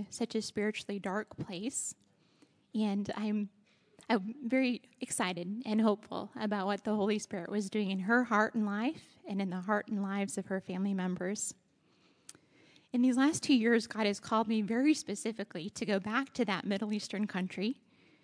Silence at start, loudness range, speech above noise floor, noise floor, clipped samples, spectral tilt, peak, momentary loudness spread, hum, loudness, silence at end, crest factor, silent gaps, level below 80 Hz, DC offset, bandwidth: 0 s; 6 LU; 36 dB; -69 dBFS; under 0.1%; -4.5 dB/octave; -14 dBFS; 9 LU; none; -34 LUFS; 0.5 s; 20 dB; none; -78 dBFS; under 0.1%; 11 kHz